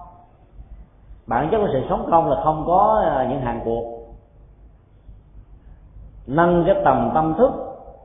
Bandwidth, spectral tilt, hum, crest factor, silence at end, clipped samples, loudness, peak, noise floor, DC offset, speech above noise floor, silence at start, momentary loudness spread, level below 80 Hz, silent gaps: 3.8 kHz; -12 dB/octave; none; 20 dB; 0.1 s; under 0.1%; -19 LUFS; -2 dBFS; -48 dBFS; under 0.1%; 30 dB; 0 s; 12 LU; -40 dBFS; none